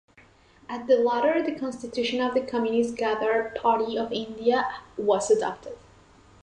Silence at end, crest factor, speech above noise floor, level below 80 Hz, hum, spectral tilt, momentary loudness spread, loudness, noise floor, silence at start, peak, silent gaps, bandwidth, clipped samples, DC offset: 0.65 s; 16 dB; 31 dB; -60 dBFS; none; -4 dB/octave; 10 LU; -25 LUFS; -56 dBFS; 0.7 s; -10 dBFS; none; 10.5 kHz; under 0.1%; under 0.1%